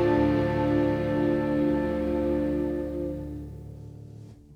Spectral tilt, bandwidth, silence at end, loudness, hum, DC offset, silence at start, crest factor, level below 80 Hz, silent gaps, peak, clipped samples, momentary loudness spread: -9 dB/octave; 6.6 kHz; 0 s; -26 LUFS; none; under 0.1%; 0 s; 14 dB; -42 dBFS; none; -12 dBFS; under 0.1%; 19 LU